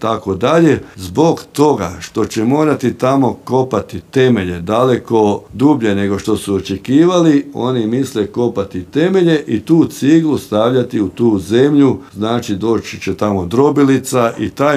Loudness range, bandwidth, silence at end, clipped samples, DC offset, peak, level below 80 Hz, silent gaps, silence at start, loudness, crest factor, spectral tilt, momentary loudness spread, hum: 1 LU; 15 kHz; 0 s; under 0.1%; under 0.1%; 0 dBFS; -48 dBFS; none; 0 s; -14 LUFS; 12 dB; -6.5 dB/octave; 7 LU; none